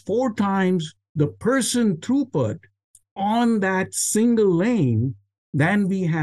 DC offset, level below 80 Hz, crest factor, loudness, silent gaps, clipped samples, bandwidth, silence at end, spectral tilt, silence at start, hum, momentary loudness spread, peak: under 0.1%; -62 dBFS; 14 dB; -21 LUFS; 1.09-1.15 s, 2.84-2.94 s, 3.11-3.16 s, 5.38-5.53 s; under 0.1%; 12.5 kHz; 0 s; -5.5 dB/octave; 0.05 s; none; 9 LU; -8 dBFS